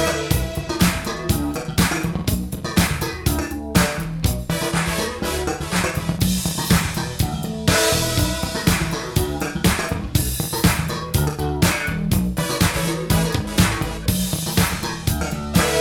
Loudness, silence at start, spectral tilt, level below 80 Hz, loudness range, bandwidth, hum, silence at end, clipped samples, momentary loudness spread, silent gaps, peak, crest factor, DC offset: -21 LUFS; 0 s; -4.5 dB/octave; -30 dBFS; 2 LU; 19 kHz; none; 0 s; under 0.1%; 5 LU; none; -2 dBFS; 20 dB; under 0.1%